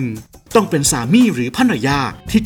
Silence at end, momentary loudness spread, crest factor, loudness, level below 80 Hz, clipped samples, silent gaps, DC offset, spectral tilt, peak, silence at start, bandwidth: 0 s; 6 LU; 16 dB; -15 LUFS; -40 dBFS; under 0.1%; none; under 0.1%; -4.5 dB/octave; 0 dBFS; 0 s; 19.5 kHz